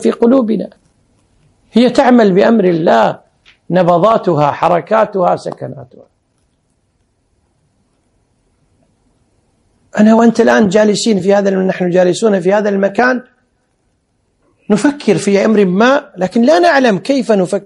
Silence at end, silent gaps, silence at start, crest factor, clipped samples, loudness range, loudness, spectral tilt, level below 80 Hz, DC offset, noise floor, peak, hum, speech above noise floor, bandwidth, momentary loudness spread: 0.05 s; none; 0 s; 12 dB; 0.2%; 6 LU; -11 LUFS; -6 dB/octave; -56 dBFS; under 0.1%; -61 dBFS; 0 dBFS; none; 51 dB; 11.5 kHz; 8 LU